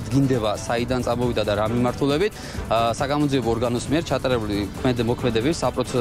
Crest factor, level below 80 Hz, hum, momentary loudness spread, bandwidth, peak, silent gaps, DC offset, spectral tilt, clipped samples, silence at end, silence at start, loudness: 14 dB; -38 dBFS; none; 3 LU; 16 kHz; -8 dBFS; none; under 0.1%; -6 dB/octave; under 0.1%; 0 s; 0 s; -23 LUFS